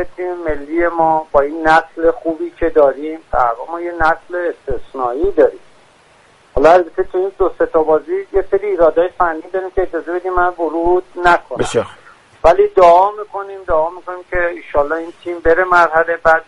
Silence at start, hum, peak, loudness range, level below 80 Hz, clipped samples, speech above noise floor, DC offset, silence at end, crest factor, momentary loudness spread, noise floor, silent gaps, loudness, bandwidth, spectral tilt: 0 s; none; 0 dBFS; 3 LU; -34 dBFS; under 0.1%; 34 dB; under 0.1%; 0.05 s; 14 dB; 11 LU; -48 dBFS; none; -15 LUFS; 11.5 kHz; -5.5 dB/octave